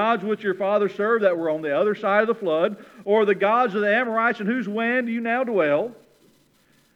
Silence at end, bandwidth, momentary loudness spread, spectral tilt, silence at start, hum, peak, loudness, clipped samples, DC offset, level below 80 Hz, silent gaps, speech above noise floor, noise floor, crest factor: 1 s; 7.8 kHz; 5 LU; -7 dB/octave; 0 s; none; -4 dBFS; -22 LUFS; under 0.1%; under 0.1%; -76 dBFS; none; 39 dB; -60 dBFS; 18 dB